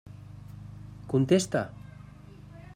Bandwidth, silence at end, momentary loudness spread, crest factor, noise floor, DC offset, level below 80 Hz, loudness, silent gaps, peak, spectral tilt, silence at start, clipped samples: 16 kHz; 0.15 s; 25 LU; 22 dB; -48 dBFS; under 0.1%; -56 dBFS; -27 LUFS; none; -10 dBFS; -6 dB/octave; 0.05 s; under 0.1%